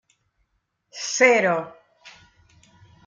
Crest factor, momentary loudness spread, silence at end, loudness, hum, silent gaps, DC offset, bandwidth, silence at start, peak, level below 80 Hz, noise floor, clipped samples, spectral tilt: 22 dB; 24 LU; 0.95 s; -20 LUFS; none; none; under 0.1%; 9.4 kHz; 0.95 s; -4 dBFS; -70 dBFS; -73 dBFS; under 0.1%; -2.5 dB/octave